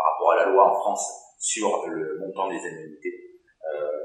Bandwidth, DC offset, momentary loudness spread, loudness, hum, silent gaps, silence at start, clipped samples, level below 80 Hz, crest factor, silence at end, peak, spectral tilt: 12 kHz; under 0.1%; 17 LU; -24 LUFS; none; none; 0 s; under 0.1%; -82 dBFS; 20 dB; 0 s; -4 dBFS; -2.5 dB/octave